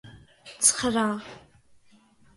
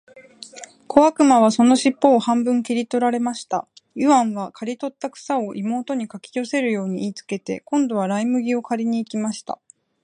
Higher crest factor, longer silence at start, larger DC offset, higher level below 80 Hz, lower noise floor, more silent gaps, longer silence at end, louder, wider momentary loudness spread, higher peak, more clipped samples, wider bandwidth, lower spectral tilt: about the same, 24 dB vs 20 dB; about the same, 0.05 s vs 0.15 s; neither; first, -60 dBFS vs -68 dBFS; first, -59 dBFS vs -41 dBFS; neither; first, 1 s vs 0.5 s; second, -23 LUFS vs -20 LUFS; about the same, 16 LU vs 16 LU; second, -6 dBFS vs 0 dBFS; neither; about the same, 12 kHz vs 11 kHz; second, -2 dB/octave vs -5 dB/octave